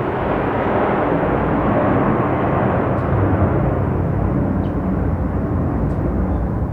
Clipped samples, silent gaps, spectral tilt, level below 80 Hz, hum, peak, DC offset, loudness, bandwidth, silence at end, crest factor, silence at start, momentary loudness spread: under 0.1%; none; -10.5 dB/octave; -28 dBFS; none; -4 dBFS; under 0.1%; -18 LUFS; 4.4 kHz; 0 s; 14 dB; 0 s; 4 LU